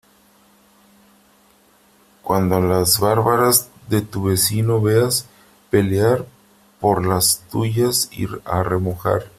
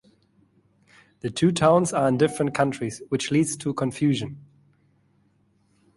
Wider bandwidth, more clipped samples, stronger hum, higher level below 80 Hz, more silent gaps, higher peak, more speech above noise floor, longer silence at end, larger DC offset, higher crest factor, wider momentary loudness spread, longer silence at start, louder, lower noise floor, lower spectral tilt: first, 16 kHz vs 11.5 kHz; neither; neither; first, -50 dBFS vs -58 dBFS; neither; first, 0 dBFS vs -6 dBFS; second, 37 dB vs 42 dB; second, 0.1 s vs 1.55 s; neither; about the same, 20 dB vs 20 dB; second, 7 LU vs 12 LU; first, 2.25 s vs 1.25 s; first, -18 LUFS vs -23 LUFS; second, -54 dBFS vs -65 dBFS; about the same, -4.5 dB/octave vs -5.5 dB/octave